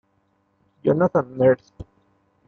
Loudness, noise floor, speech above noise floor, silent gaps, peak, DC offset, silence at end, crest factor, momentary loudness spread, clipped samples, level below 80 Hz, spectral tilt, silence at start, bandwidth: -21 LUFS; -67 dBFS; 47 dB; none; -6 dBFS; under 0.1%; 0.65 s; 18 dB; 7 LU; under 0.1%; -56 dBFS; -10 dB/octave; 0.85 s; 6.4 kHz